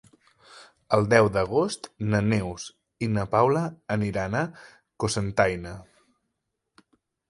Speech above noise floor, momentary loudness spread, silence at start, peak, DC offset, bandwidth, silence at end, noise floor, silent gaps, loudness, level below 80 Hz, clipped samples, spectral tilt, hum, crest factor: 56 dB; 14 LU; 0.55 s; -4 dBFS; under 0.1%; 11.5 kHz; 1.45 s; -80 dBFS; none; -25 LUFS; -50 dBFS; under 0.1%; -6 dB/octave; none; 22 dB